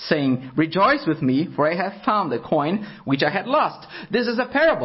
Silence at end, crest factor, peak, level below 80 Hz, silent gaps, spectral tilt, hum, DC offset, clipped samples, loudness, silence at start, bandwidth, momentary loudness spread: 0 s; 18 dB; -4 dBFS; -58 dBFS; none; -10 dB/octave; none; under 0.1%; under 0.1%; -21 LUFS; 0 s; 5.8 kHz; 7 LU